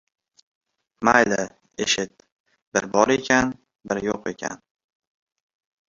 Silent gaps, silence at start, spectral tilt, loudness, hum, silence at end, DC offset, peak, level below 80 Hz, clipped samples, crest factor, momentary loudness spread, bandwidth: 2.32-2.44 s, 2.62-2.72 s; 1 s; -3 dB/octave; -22 LUFS; none; 1.4 s; under 0.1%; -2 dBFS; -56 dBFS; under 0.1%; 24 dB; 15 LU; 7.6 kHz